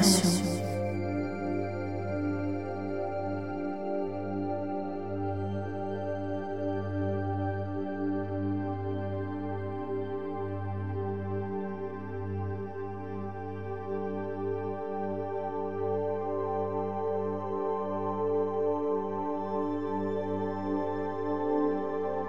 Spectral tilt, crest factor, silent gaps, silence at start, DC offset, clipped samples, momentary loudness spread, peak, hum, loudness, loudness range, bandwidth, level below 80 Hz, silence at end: -5.5 dB/octave; 22 dB; none; 0 s; 0.5%; under 0.1%; 6 LU; -10 dBFS; none; -33 LUFS; 4 LU; 16 kHz; -68 dBFS; 0 s